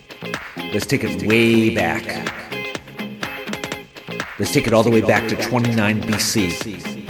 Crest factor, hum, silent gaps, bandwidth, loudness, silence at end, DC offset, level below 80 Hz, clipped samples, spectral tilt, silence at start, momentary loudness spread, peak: 20 dB; none; none; 19 kHz; -20 LUFS; 0 s; under 0.1%; -48 dBFS; under 0.1%; -4.5 dB/octave; 0.1 s; 14 LU; 0 dBFS